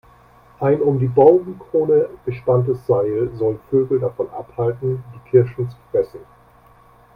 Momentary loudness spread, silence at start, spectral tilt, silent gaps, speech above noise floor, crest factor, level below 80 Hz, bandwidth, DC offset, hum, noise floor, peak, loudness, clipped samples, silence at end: 12 LU; 0.6 s; -11 dB/octave; none; 32 dB; 18 dB; -52 dBFS; 4.9 kHz; under 0.1%; none; -50 dBFS; 0 dBFS; -19 LUFS; under 0.1%; 0.95 s